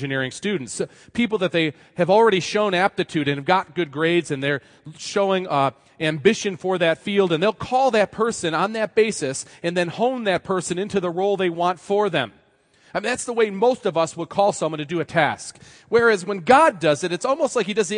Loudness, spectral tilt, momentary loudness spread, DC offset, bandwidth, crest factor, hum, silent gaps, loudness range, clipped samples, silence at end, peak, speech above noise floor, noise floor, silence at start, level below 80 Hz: -21 LUFS; -4.5 dB/octave; 9 LU; under 0.1%; 10.5 kHz; 20 dB; none; none; 3 LU; under 0.1%; 0 s; -2 dBFS; 37 dB; -58 dBFS; 0 s; -62 dBFS